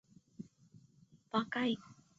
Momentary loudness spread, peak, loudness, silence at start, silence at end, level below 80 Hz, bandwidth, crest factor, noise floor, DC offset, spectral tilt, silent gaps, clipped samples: 19 LU; -20 dBFS; -37 LUFS; 0.4 s; 0.25 s; -80 dBFS; 7.8 kHz; 22 dB; -66 dBFS; under 0.1%; -3 dB/octave; none; under 0.1%